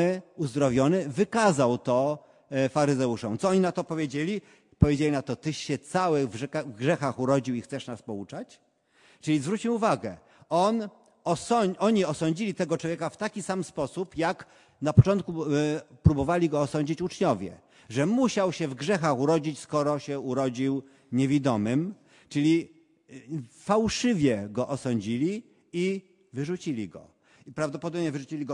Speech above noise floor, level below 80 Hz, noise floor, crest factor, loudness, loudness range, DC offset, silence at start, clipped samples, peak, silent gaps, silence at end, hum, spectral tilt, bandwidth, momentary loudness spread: 35 dB; -52 dBFS; -62 dBFS; 24 dB; -27 LUFS; 4 LU; under 0.1%; 0 s; under 0.1%; -4 dBFS; none; 0 s; none; -6.5 dB/octave; 11.5 kHz; 12 LU